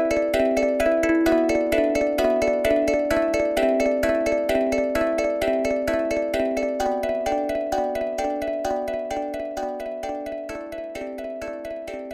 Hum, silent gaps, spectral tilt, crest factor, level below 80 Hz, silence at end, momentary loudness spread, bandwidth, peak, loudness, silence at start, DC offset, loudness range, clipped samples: none; none; -4.5 dB/octave; 16 dB; -44 dBFS; 0 s; 11 LU; 15.5 kHz; -8 dBFS; -23 LUFS; 0 s; under 0.1%; 8 LU; under 0.1%